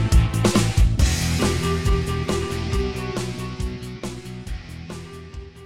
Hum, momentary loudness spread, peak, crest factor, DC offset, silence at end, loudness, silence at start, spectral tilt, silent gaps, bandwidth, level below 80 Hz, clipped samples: none; 16 LU; -4 dBFS; 16 dB; 0.3%; 0 s; -23 LUFS; 0 s; -5.5 dB/octave; none; 16 kHz; -26 dBFS; under 0.1%